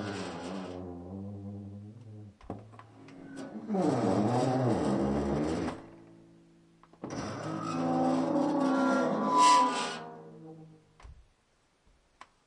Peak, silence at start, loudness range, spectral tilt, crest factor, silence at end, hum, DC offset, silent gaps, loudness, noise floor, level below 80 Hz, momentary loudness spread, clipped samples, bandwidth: -12 dBFS; 0 s; 11 LU; -5.5 dB/octave; 20 dB; 1.35 s; none; under 0.1%; none; -30 LUFS; -70 dBFS; -58 dBFS; 22 LU; under 0.1%; 11.5 kHz